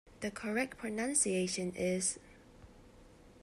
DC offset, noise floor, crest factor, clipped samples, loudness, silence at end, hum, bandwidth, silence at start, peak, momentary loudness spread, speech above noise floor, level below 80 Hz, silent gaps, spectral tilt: under 0.1%; -59 dBFS; 22 dB; under 0.1%; -34 LUFS; 0.05 s; none; 13.5 kHz; 0.05 s; -16 dBFS; 10 LU; 23 dB; -64 dBFS; none; -3.5 dB/octave